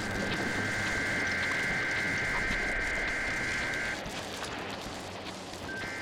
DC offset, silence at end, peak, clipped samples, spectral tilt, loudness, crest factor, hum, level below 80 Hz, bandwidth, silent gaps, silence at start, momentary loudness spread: under 0.1%; 0 s; -20 dBFS; under 0.1%; -3.5 dB/octave; -31 LUFS; 14 dB; none; -48 dBFS; 17 kHz; none; 0 s; 10 LU